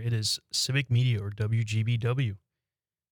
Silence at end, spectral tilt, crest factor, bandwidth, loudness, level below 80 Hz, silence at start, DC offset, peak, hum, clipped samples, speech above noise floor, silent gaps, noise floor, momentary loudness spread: 0.75 s; -4.5 dB/octave; 16 dB; 19 kHz; -28 LUFS; -64 dBFS; 0 s; under 0.1%; -12 dBFS; none; under 0.1%; over 63 dB; none; under -90 dBFS; 5 LU